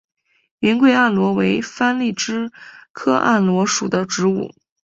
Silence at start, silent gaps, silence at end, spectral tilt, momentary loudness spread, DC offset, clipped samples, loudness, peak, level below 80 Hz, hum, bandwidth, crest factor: 0.6 s; 2.90-2.94 s; 0.4 s; -4.5 dB/octave; 11 LU; under 0.1%; under 0.1%; -18 LUFS; -2 dBFS; -60 dBFS; none; 8 kHz; 16 dB